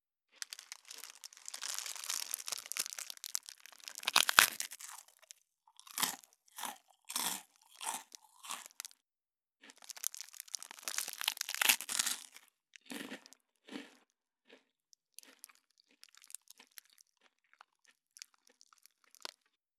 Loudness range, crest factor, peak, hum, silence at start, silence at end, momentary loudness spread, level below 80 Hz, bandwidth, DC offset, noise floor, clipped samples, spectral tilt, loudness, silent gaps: 24 LU; 40 dB; -2 dBFS; none; 0.6 s; 3.15 s; 26 LU; under -90 dBFS; 19 kHz; under 0.1%; under -90 dBFS; under 0.1%; 2 dB/octave; -36 LUFS; none